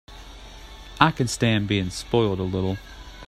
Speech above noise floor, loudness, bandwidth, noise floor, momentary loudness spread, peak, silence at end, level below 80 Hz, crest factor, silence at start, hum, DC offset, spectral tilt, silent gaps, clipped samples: 19 dB; -23 LUFS; 15 kHz; -42 dBFS; 22 LU; 0 dBFS; 0 s; -44 dBFS; 24 dB; 0.1 s; none; under 0.1%; -5.5 dB/octave; none; under 0.1%